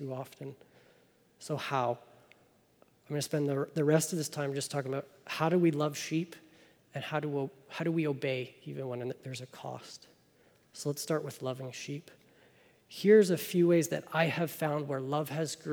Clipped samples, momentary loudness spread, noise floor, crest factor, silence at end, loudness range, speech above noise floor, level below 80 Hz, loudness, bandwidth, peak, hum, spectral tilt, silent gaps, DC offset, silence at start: under 0.1%; 16 LU; -66 dBFS; 20 dB; 0 s; 10 LU; 34 dB; -82 dBFS; -32 LUFS; over 20 kHz; -12 dBFS; none; -5.5 dB/octave; none; under 0.1%; 0 s